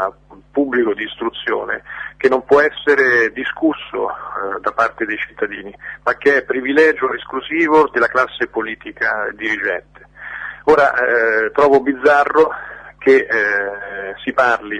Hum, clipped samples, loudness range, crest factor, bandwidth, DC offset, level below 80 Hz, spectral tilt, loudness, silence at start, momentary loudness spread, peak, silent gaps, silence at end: none; under 0.1%; 4 LU; 16 dB; 9.6 kHz; under 0.1%; -52 dBFS; -5 dB/octave; -16 LUFS; 0 s; 12 LU; -2 dBFS; none; 0 s